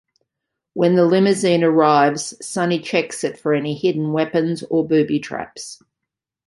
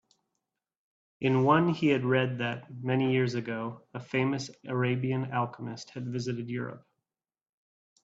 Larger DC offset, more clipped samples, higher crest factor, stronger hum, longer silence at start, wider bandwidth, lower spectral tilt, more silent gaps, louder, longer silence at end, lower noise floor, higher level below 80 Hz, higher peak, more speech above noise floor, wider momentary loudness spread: neither; neither; about the same, 18 dB vs 20 dB; neither; second, 0.75 s vs 1.2 s; first, 11.5 kHz vs 7.8 kHz; second, -5.5 dB/octave vs -7 dB/octave; neither; first, -18 LUFS vs -30 LUFS; second, 0.75 s vs 1.25 s; second, -83 dBFS vs -88 dBFS; first, -64 dBFS vs -70 dBFS; first, -2 dBFS vs -10 dBFS; first, 65 dB vs 59 dB; about the same, 14 LU vs 13 LU